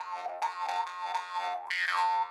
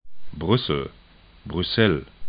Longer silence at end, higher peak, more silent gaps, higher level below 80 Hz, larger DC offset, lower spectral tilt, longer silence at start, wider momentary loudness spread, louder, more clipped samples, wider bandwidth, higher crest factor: about the same, 0 s vs 0 s; second, -16 dBFS vs -4 dBFS; neither; second, -88 dBFS vs -44 dBFS; neither; second, 1.5 dB/octave vs -11 dB/octave; about the same, 0 s vs 0 s; second, 7 LU vs 19 LU; second, -32 LUFS vs -23 LUFS; neither; first, 13 kHz vs 5.2 kHz; second, 16 dB vs 22 dB